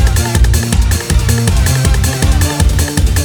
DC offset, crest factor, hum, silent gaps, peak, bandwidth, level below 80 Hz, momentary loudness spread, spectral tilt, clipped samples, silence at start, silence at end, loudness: under 0.1%; 10 dB; none; none; 0 dBFS; over 20 kHz; -14 dBFS; 1 LU; -4.5 dB/octave; 0.1%; 0 s; 0 s; -12 LUFS